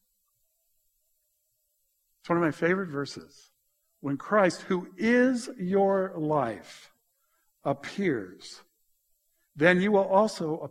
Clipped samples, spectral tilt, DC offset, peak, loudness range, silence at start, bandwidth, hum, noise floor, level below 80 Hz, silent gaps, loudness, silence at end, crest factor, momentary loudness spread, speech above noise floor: under 0.1%; -6 dB/octave; under 0.1%; -4 dBFS; 6 LU; 2.25 s; 13 kHz; none; -75 dBFS; -68 dBFS; none; -27 LUFS; 0 s; 24 dB; 15 LU; 48 dB